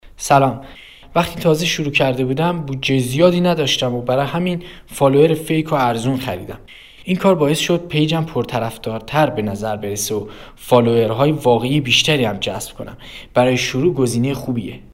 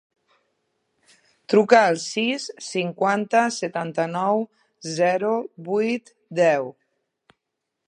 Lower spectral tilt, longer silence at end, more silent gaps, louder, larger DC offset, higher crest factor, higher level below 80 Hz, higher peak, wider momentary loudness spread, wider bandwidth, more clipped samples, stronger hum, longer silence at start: about the same, -5 dB/octave vs -4.5 dB/octave; second, 0.05 s vs 1.15 s; neither; first, -17 LUFS vs -22 LUFS; neither; about the same, 18 dB vs 22 dB; first, -44 dBFS vs -78 dBFS; about the same, 0 dBFS vs -2 dBFS; about the same, 13 LU vs 13 LU; first, 16 kHz vs 10.5 kHz; neither; neither; second, 0.05 s vs 1.5 s